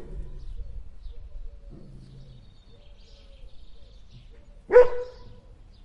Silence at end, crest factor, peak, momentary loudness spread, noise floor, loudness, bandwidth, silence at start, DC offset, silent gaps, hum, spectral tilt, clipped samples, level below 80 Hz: 0.5 s; 24 dB; -6 dBFS; 30 LU; -49 dBFS; -20 LUFS; 6 kHz; 0 s; under 0.1%; none; none; -7 dB/octave; under 0.1%; -42 dBFS